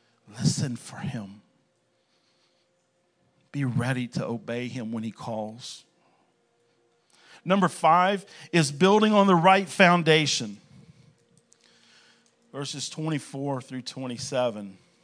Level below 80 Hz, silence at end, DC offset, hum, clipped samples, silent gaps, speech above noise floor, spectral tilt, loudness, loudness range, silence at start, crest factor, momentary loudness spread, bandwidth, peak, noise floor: -72 dBFS; 0.3 s; under 0.1%; none; under 0.1%; none; 46 dB; -5 dB/octave; -25 LUFS; 15 LU; 0.3 s; 26 dB; 19 LU; 10.5 kHz; -2 dBFS; -70 dBFS